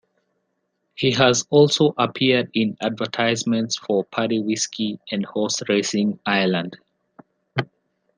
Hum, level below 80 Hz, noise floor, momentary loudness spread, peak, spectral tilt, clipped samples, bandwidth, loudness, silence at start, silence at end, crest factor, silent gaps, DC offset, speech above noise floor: none; -64 dBFS; -73 dBFS; 11 LU; -2 dBFS; -4 dB/octave; under 0.1%; 10 kHz; -21 LUFS; 1 s; 0.55 s; 20 dB; none; under 0.1%; 53 dB